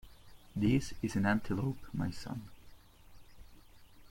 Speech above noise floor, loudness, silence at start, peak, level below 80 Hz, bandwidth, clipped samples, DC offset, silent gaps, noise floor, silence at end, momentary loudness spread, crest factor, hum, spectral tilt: 23 dB; -35 LUFS; 0.05 s; -18 dBFS; -54 dBFS; 16.5 kHz; under 0.1%; under 0.1%; none; -56 dBFS; 0.05 s; 14 LU; 18 dB; none; -6.5 dB/octave